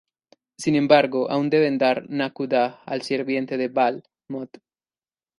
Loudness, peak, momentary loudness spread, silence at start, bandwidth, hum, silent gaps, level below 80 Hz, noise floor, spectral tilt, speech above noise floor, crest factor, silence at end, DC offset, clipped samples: -22 LUFS; -2 dBFS; 17 LU; 0.6 s; 11.5 kHz; none; none; -70 dBFS; under -90 dBFS; -5.5 dB/octave; over 68 dB; 22 dB; 0.95 s; under 0.1%; under 0.1%